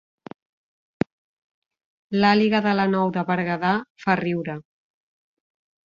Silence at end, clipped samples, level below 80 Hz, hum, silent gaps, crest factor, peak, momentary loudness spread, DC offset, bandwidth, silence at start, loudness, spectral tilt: 1.25 s; under 0.1%; -62 dBFS; none; 3.90-3.95 s; 22 dB; -4 dBFS; 12 LU; under 0.1%; 7.2 kHz; 2.1 s; -22 LUFS; -7.5 dB/octave